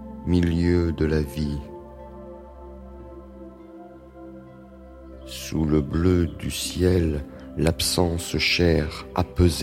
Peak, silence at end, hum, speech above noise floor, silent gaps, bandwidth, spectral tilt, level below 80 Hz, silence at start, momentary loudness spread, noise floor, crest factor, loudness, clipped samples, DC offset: -6 dBFS; 0 s; none; 22 dB; none; 16 kHz; -5.5 dB/octave; -36 dBFS; 0 s; 22 LU; -44 dBFS; 20 dB; -23 LUFS; under 0.1%; under 0.1%